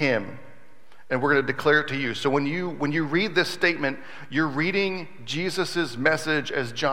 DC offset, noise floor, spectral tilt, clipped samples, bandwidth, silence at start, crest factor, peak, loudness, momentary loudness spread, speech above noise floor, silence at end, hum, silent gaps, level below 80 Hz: 1%; -56 dBFS; -5 dB/octave; under 0.1%; 16 kHz; 0 s; 20 dB; -4 dBFS; -24 LUFS; 8 LU; 31 dB; 0 s; none; none; -68 dBFS